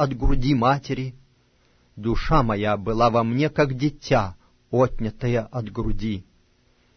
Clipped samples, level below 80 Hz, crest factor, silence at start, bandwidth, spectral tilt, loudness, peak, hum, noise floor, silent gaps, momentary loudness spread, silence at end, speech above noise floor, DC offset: under 0.1%; -32 dBFS; 18 dB; 0 s; 6.4 kHz; -7.5 dB/octave; -23 LUFS; -4 dBFS; none; -61 dBFS; none; 10 LU; 0.75 s; 40 dB; under 0.1%